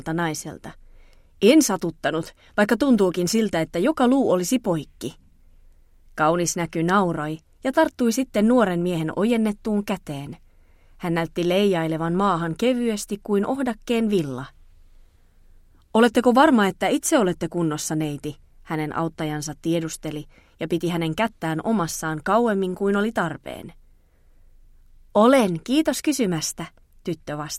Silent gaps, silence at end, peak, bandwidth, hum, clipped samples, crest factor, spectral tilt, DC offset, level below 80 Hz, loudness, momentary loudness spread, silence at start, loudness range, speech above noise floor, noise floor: none; 0 s; -4 dBFS; 16.5 kHz; none; under 0.1%; 20 dB; -5 dB/octave; under 0.1%; -50 dBFS; -22 LUFS; 15 LU; 0 s; 5 LU; 33 dB; -54 dBFS